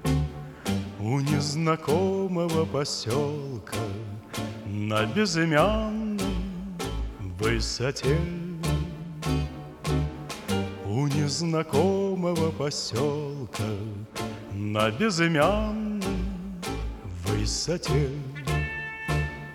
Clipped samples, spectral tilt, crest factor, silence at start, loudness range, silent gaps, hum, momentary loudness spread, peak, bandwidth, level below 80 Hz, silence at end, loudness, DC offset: under 0.1%; -5.5 dB/octave; 20 dB; 0 s; 3 LU; none; none; 11 LU; -6 dBFS; 17 kHz; -38 dBFS; 0 s; -28 LUFS; under 0.1%